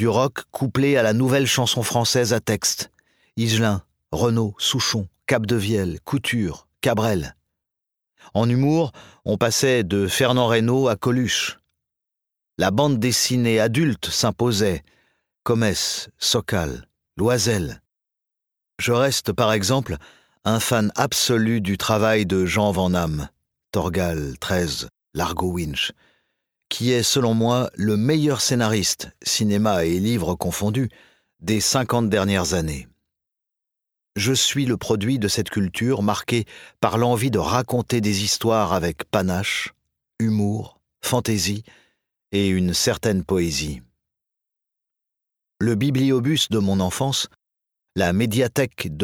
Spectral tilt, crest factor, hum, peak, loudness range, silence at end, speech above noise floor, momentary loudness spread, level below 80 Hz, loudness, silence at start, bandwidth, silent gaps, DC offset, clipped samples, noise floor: -4.5 dB/octave; 20 dB; none; -2 dBFS; 4 LU; 0 s; 64 dB; 9 LU; -46 dBFS; -21 LUFS; 0 s; 18.5 kHz; none; under 0.1%; under 0.1%; -84 dBFS